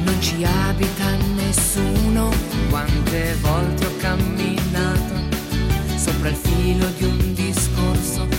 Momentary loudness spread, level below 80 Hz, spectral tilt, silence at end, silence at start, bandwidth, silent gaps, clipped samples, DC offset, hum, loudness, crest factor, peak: 3 LU; -26 dBFS; -5 dB/octave; 0 s; 0 s; 17 kHz; none; under 0.1%; under 0.1%; none; -20 LUFS; 12 dB; -8 dBFS